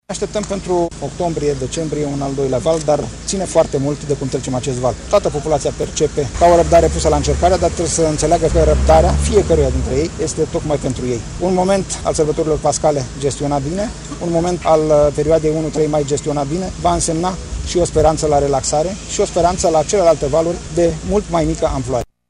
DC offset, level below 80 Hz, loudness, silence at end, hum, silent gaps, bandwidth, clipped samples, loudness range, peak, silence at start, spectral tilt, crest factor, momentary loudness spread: under 0.1%; -26 dBFS; -16 LUFS; 0.25 s; none; none; 11.5 kHz; under 0.1%; 4 LU; -2 dBFS; 0.1 s; -5.5 dB/octave; 14 dB; 8 LU